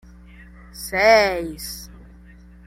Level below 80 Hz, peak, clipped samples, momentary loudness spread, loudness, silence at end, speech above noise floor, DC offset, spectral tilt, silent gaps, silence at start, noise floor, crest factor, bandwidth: -44 dBFS; -4 dBFS; under 0.1%; 21 LU; -18 LUFS; 0.8 s; 26 dB; under 0.1%; -3 dB/octave; none; 0.75 s; -45 dBFS; 18 dB; 16 kHz